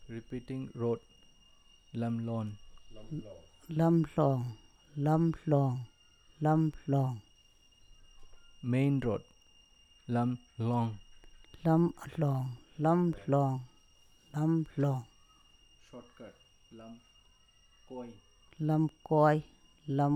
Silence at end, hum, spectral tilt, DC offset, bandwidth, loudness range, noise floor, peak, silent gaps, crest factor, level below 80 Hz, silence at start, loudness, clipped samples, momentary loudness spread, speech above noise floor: 0 s; none; -9 dB/octave; under 0.1%; 9.8 kHz; 8 LU; -64 dBFS; -14 dBFS; none; 20 dB; -60 dBFS; 0 s; -32 LUFS; under 0.1%; 23 LU; 33 dB